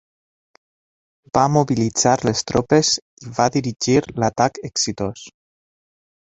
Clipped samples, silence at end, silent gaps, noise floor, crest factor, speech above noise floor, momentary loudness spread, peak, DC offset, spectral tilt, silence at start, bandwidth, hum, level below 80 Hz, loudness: under 0.1%; 1.05 s; 3.02-3.17 s; under -90 dBFS; 20 dB; over 71 dB; 7 LU; -2 dBFS; under 0.1%; -4.5 dB/octave; 1.35 s; 8.4 kHz; none; -50 dBFS; -19 LUFS